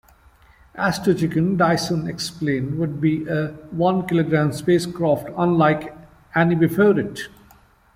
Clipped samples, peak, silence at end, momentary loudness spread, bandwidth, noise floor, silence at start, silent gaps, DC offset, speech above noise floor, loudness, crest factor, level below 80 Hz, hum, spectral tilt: under 0.1%; -4 dBFS; 0.7 s; 8 LU; 16 kHz; -53 dBFS; 0.75 s; none; under 0.1%; 33 dB; -20 LUFS; 16 dB; -52 dBFS; none; -6.5 dB/octave